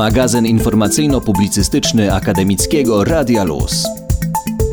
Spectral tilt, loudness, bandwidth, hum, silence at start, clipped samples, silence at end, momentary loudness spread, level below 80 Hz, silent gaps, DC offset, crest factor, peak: -5 dB/octave; -14 LUFS; over 20 kHz; none; 0 s; under 0.1%; 0 s; 5 LU; -26 dBFS; none; under 0.1%; 10 dB; -4 dBFS